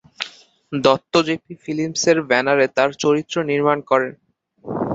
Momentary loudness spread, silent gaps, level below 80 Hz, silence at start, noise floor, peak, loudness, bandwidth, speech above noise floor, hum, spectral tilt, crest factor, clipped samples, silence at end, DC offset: 13 LU; none; -60 dBFS; 0.2 s; -42 dBFS; -2 dBFS; -19 LUFS; 8 kHz; 24 dB; none; -4 dB/octave; 18 dB; under 0.1%; 0 s; under 0.1%